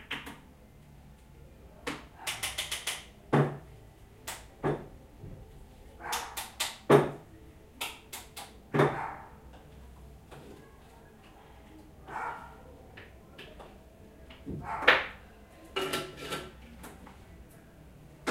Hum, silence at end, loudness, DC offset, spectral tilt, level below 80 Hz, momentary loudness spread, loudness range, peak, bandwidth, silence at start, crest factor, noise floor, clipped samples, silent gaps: none; 0 s; -32 LUFS; under 0.1%; -4 dB/octave; -56 dBFS; 26 LU; 15 LU; -6 dBFS; 16 kHz; 0 s; 30 dB; -54 dBFS; under 0.1%; none